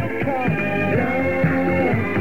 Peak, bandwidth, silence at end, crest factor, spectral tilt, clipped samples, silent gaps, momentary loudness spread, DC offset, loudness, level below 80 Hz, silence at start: -8 dBFS; 16.5 kHz; 0 s; 12 dB; -8.5 dB/octave; under 0.1%; none; 2 LU; 2%; -20 LUFS; -44 dBFS; 0 s